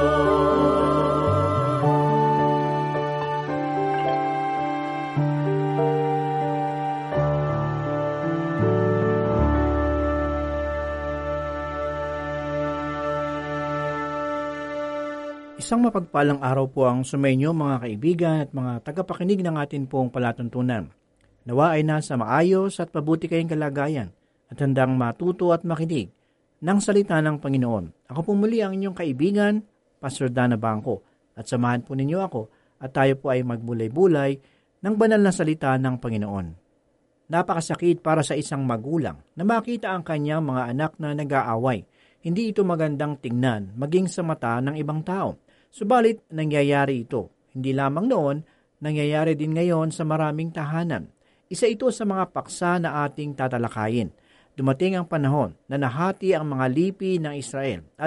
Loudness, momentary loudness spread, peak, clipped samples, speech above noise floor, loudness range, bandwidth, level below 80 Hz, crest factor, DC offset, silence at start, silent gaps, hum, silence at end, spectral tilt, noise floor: -24 LUFS; 9 LU; -6 dBFS; under 0.1%; 43 dB; 3 LU; 11.5 kHz; -42 dBFS; 16 dB; under 0.1%; 0 s; none; none; 0 s; -7 dB/octave; -66 dBFS